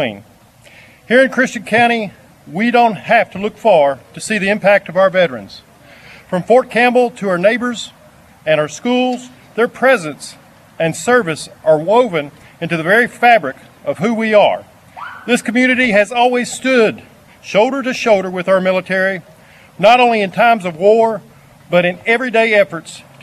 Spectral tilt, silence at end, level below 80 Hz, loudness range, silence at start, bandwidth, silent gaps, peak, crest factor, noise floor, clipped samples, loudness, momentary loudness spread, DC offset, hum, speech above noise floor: -4.5 dB/octave; 0.2 s; -58 dBFS; 3 LU; 0 s; 13.5 kHz; none; 0 dBFS; 14 dB; -44 dBFS; under 0.1%; -14 LUFS; 15 LU; under 0.1%; none; 30 dB